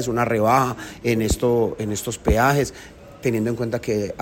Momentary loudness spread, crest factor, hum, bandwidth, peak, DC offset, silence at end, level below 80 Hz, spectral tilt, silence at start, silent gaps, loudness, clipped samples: 9 LU; 16 dB; none; 16.5 kHz; -4 dBFS; under 0.1%; 0 s; -34 dBFS; -5.5 dB/octave; 0 s; none; -21 LUFS; under 0.1%